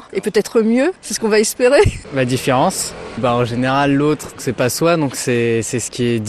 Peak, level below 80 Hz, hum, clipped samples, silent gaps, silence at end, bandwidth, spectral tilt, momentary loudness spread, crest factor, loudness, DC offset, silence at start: 0 dBFS; -38 dBFS; none; under 0.1%; none; 0 s; 13.5 kHz; -5 dB/octave; 7 LU; 16 dB; -16 LUFS; 0.1%; 0 s